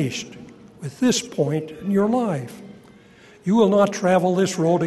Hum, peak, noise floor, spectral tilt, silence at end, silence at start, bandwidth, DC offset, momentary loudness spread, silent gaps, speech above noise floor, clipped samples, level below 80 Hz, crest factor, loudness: none; -4 dBFS; -49 dBFS; -5.5 dB/octave; 0 s; 0 s; 12.5 kHz; under 0.1%; 19 LU; none; 29 dB; under 0.1%; -62 dBFS; 18 dB; -21 LUFS